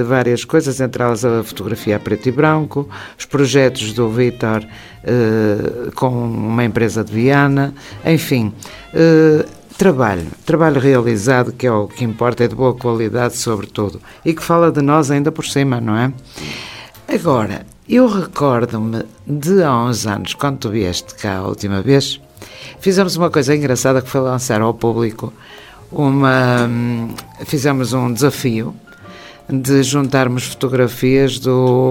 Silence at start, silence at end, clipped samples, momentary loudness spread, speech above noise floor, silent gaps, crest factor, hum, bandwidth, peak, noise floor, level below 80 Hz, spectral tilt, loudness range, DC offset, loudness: 0 s; 0 s; under 0.1%; 11 LU; 22 dB; none; 16 dB; none; 17 kHz; 0 dBFS; -37 dBFS; -46 dBFS; -6 dB/octave; 3 LU; under 0.1%; -15 LUFS